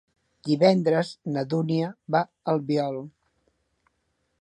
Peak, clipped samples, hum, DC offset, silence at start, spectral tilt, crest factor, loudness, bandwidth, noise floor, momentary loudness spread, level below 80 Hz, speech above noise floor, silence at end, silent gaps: -6 dBFS; under 0.1%; none; under 0.1%; 0.45 s; -7.5 dB/octave; 20 dB; -25 LUFS; 11 kHz; -74 dBFS; 12 LU; -72 dBFS; 50 dB; 1.3 s; none